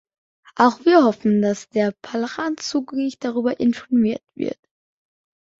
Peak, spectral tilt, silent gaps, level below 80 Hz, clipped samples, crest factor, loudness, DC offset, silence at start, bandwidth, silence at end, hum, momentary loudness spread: -2 dBFS; -5.5 dB/octave; none; -62 dBFS; under 0.1%; 20 dB; -20 LUFS; under 0.1%; 0.55 s; 7.8 kHz; 1.05 s; none; 13 LU